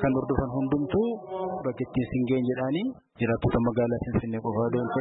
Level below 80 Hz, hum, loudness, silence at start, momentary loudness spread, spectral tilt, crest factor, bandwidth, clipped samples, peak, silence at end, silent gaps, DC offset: -46 dBFS; none; -28 LUFS; 0 s; 6 LU; -12 dB/octave; 14 dB; 4 kHz; under 0.1%; -14 dBFS; 0 s; none; under 0.1%